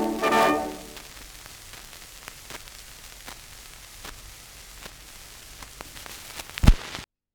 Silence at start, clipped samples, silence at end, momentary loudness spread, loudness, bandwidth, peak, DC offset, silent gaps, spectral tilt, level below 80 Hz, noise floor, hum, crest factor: 0 s; under 0.1%; 0.3 s; 20 LU; -26 LUFS; over 20 kHz; 0 dBFS; under 0.1%; none; -4.5 dB/octave; -32 dBFS; -45 dBFS; none; 28 dB